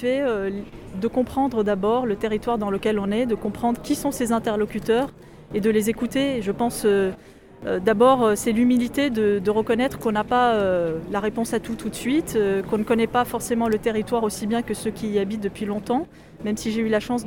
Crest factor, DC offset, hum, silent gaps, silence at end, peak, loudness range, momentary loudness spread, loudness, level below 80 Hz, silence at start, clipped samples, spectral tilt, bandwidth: 16 dB; under 0.1%; none; none; 0 s; -6 dBFS; 3 LU; 8 LU; -23 LUFS; -48 dBFS; 0 s; under 0.1%; -5.5 dB/octave; 17.5 kHz